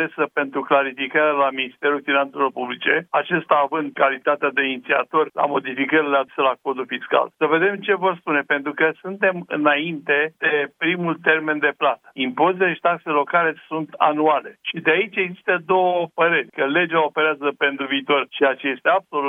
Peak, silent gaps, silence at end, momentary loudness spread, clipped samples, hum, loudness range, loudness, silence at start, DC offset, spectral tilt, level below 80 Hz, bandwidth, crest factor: -2 dBFS; none; 0 s; 4 LU; under 0.1%; none; 1 LU; -20 LUFS; 0 s; under 0.1%; -7.5 dB/octave; -78 dBFS; 3.9 kHz; 18 dB